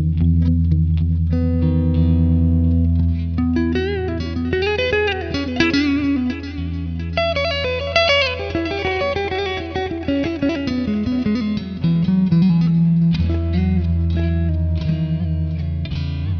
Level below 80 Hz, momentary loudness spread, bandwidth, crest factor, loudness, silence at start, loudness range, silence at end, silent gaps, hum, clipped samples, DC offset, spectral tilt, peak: -28 dBFS; 8 LU; 6.4 kHz; 18 dB; -19 LUFS; 0 s; 3 LU; 0 s; none; none; under 0.1%; under 0.1%; -7.5 dB/octave; 0 dBFS